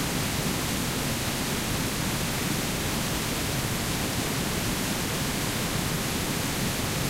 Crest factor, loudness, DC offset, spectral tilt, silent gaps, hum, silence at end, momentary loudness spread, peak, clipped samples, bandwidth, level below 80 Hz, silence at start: 14 dB; -27 LUFS; under 0.1%; -3.5 dB/octave; none; none; 0 s; 0 LU; -14 dBFS; under 0.1%; 16 kHz; -40 dBFS; 0 s